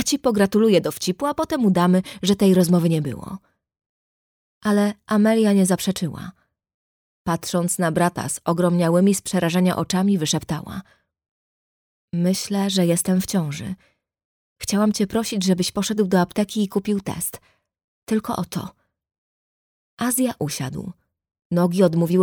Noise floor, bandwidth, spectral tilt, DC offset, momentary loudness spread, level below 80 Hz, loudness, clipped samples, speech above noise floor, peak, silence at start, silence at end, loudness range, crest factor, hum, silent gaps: under -90 dBFS; 19.5 kHz; -5.5 dB/octave; under 0.1%; 13 LU; -56 dBFS; -21 LUFS; under 0.1%; over 70 dB; -4 dBFS; 0 s; 0 s; 7 LU; 18 dB; none; 3.86-4.61 s, 6.74-7.25 s, 11.31-12.08 s, 14.25-14.56 s, 17.84-18.02 s, 19.18-19.97 s, 21.45-21.50 s